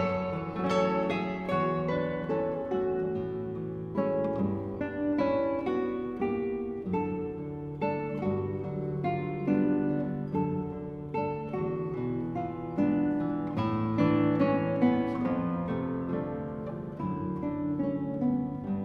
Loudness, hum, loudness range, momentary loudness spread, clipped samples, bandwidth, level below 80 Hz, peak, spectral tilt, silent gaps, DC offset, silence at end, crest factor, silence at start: -31 LUFS; none; 4 LU; 8 LU; under 0.1%; 7.2 kHz; -56 dBFS; -14 dBFS; -9 dB/octave; none; under 0.1%; 0 s; 16 dB; 0 s